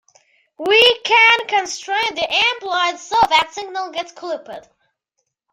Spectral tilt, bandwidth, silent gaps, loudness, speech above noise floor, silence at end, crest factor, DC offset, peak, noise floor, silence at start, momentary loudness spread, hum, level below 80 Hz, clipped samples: -0.5 dB/octave; 16 kHz; none; -15 LUFS; 57 dB; 0.9 s; 18 dB; under 0.1%; 0 dBFS; -75 dBFS; 0.6 s; 16 LU; none; -58 dBFS; under 0.1%